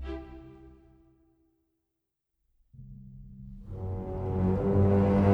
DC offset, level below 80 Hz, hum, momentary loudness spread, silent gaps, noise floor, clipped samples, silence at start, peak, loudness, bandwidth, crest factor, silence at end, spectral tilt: under 0.1%; -46 dBFS; none; 26 LU; none; -84 dBFS; under 0.1%; 0 s; -12 dBFS; -28 LUFS; 4.7 kHz; 20 dB; 0 s; -10.5 dB/octave